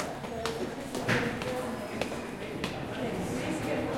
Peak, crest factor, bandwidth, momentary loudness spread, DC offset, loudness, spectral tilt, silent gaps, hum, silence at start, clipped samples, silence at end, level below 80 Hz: -14 dBFS; 20 dB; 16.5 kHz; 7 LU; under 0.1%; -33 LUFS; -5 dB/octave; none; none; 0 s; under 0.1%; 0 s; -54 dBFS